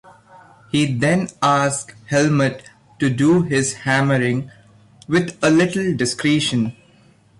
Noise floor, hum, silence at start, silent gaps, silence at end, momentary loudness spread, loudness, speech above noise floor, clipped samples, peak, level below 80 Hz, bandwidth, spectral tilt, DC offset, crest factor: -52 dBFS; none; 0.75 s; none; 0.7 s; 7 LU; -18 LUFS; 34 dB; under 0.1%; -6 dBFS; -54 dBFS; 11.5 kHz; -5 dB/octave; under 0.1%; 14 dB